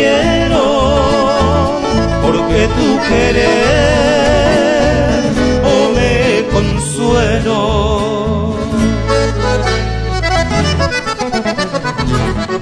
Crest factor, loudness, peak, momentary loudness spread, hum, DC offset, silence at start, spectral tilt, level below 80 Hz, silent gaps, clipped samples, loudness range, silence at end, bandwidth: 12 dB; -13 LUFS; 0 dBFS; 6 LU; none; under 0.1%; 0 s; -5.5 dB/octave; -22 dBFS; none; under 0.1%; 3 LU; 0 s; 11 kHz